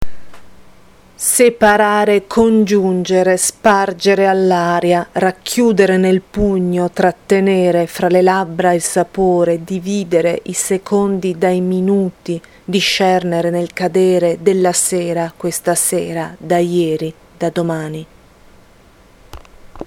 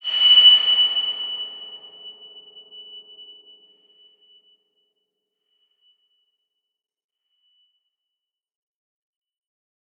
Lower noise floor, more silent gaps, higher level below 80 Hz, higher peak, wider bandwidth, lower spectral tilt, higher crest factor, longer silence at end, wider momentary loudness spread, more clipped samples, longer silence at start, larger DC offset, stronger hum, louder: second, -46 dBFS vs -86 dBFS; neither; first, -42 dBFS vs under -90 dBFS; first, 0 dBFS vs -4 dBFS; first, 17 kHz vs 6.2 kHz; first, -4.5 dB/octave vs 0 dB/octave; second, 14 dB vs 22 dB; second, 0 s vs 7 s; second, 8 LU vs 30 LU; neither; about the same, 0 s vs 0.05 s; neither; neither; about the same, -14 LUFS vs -13 LUFS